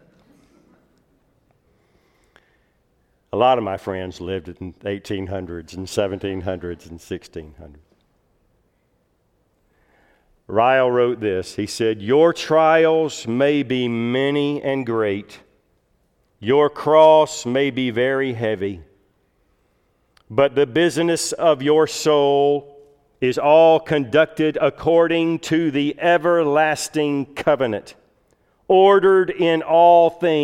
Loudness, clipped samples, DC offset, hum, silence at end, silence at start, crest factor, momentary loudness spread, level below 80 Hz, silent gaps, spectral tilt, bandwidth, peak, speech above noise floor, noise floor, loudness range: -18 LUFS; under 0.1%; under 0.1%; none; 0 s; 3.35 s; 18 dB; 16 LU; -56 dBFS; none; -5 dB/octave; 15 kHz; -2 dBFS; 47 dB; -65 dBFS; 11 LU